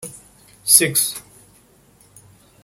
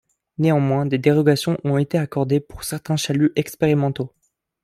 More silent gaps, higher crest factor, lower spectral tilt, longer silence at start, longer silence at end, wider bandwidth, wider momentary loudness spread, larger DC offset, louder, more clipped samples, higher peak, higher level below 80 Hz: neither; about the same, 22 dB vs 18 dB; second, -1 dB/octave vs -6.5 dB/octave; second, 0 s vs 0.4 s; first, 1.45 s vs 0.55 s; about the same, 17 kHz vs 15.5 kHz; first, 23 LU vs 11 LU; neither; first, -15 LUFS vs -20 LUFS; neither; about the same, 0 dBFS vs -2 dBFS; second, -60 dBFS vs -52 dBFS